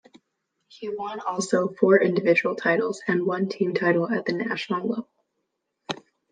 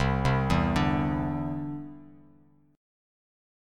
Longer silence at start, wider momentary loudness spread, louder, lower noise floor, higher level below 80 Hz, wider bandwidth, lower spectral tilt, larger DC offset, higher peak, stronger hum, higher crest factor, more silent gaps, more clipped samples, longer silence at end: first, 0.75 s vs 0 s; about the same, 15 LU vs 13 LU; first, -24 LUFS vs -28 LUFS; first, -78 dBFS vs -60 dBFS; second, -76 dBFS vs -40 dBFS; second, 9.6 kHz vs 12 kHz; second, -5.5 dB/octave vs -7 dB/octave; neither; first, -4 dBFS vs -10 dBFS; neither; about the same, 22 dB vs 20 dB; neither; neither; second, 0.35 s vs 0.95 s